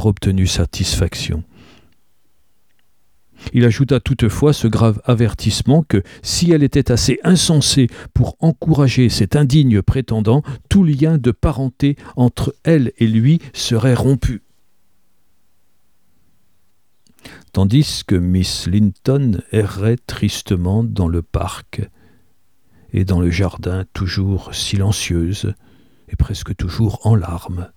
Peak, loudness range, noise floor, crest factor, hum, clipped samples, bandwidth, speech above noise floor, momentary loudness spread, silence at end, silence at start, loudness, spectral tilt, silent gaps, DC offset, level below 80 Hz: -2 dBFS; 7 LU; -65 dBFS; 16 dB; none; under 0.1%; 16.5 kHz; 50 dB; 10 LU; 0.1 s; 0 s; -16 LUFS; -6 dB/octave; none; 0.3%; -32 dBFS